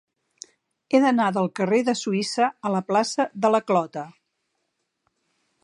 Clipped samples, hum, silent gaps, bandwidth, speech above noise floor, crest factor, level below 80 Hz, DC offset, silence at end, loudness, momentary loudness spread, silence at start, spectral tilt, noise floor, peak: under 0.1%; none; none; 11.5 kHz; 54 dB; 20 dB; -78 dBFS; under 0.1%; 1.55 s; -22 LUFS; 6 LU; 0.9 s; -5 dB/octave; -76 dBFS; -4 dBFS